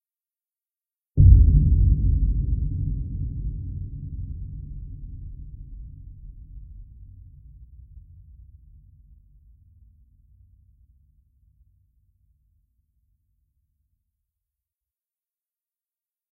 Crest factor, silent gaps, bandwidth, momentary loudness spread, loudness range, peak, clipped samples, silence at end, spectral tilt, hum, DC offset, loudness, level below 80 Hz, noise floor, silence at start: 24 dB; none; 0.6 kHz; 29 LU; 26 LU; -2 dBFS; under 0.1%; 8.3 s; -16 dB/octave; none; under 0.1%; -22 LUFS; -28 dBFS; under -90 dBFS; 1.15 s